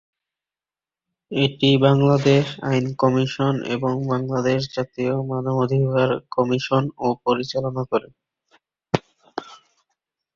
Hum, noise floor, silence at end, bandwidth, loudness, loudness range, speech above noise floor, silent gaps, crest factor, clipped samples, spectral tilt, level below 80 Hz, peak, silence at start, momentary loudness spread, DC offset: none; under -90 dBFS; 0.8 s; 7.4 kHz; -21 LUFS; 6 LU; over 70 dB; none; 20 dB; under 0.1%; -7 dB/octave; -56 dBFS; -2 dBFS; 1.3 s; 10 LU; under 0.1%